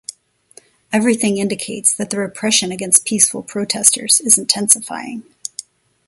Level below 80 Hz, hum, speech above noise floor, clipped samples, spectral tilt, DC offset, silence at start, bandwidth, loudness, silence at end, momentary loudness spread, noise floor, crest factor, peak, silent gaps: -62 dBFS; none; 32 dB; 0.1%; -2 dB/octave; under 0.1%; 0.9 s; 16 kHz; -14 LUFS; 0.45 s; 18 LU; -49 dBFS; 18 dB; 0 dBFS; none